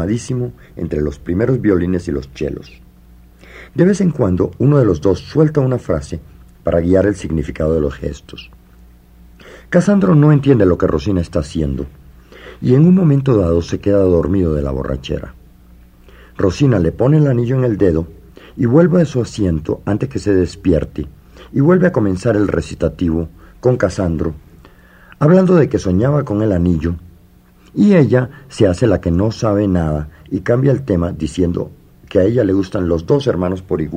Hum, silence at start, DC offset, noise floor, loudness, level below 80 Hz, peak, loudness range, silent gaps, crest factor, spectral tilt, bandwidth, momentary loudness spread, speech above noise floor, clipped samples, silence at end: none; 0 s; under 0.1%; -46 dBFS; -15 LUFS; -36 dBFS; 0 dBFS; 4 LU; none; 16 dB; -8 dB/octave; 10 kHz; 13 LU; 32 dB; under 0.1%; 0 s